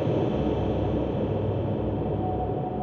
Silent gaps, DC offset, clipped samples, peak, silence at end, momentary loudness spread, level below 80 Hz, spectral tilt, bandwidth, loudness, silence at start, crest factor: none; under 0.1%; under 0.1%; -14 dBFS; 0 s; 3 LU; -38 dBFS; -10 dB/octave; 6.6 kHz; -27 LUFS; 0 s; 12 dB